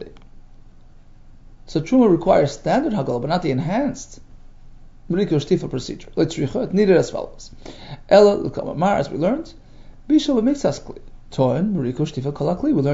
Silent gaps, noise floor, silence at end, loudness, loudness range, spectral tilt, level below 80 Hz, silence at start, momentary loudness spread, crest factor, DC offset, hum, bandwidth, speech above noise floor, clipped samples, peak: none; -44 dBFS; 0 s; -20 LUFS; 4 LU; -7 dB/octave; -42 dBFS; 0 s; 19 LU; 20 dB; under 0.1%; none; 8 kHz; 25 dB; under 0.1%; -2 dBFS